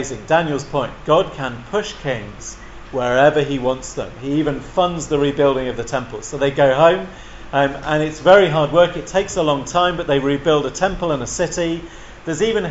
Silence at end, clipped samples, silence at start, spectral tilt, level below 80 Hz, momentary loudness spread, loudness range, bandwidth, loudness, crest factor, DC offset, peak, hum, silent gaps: 0 s; under 0.1%; 0 s; -5 dB/octave; -40 dBFS; 13 LU; 4 LU; 8.2 kHz; -18 LUFS; 18 dB; under 0.1%; 0 dBFS; none; none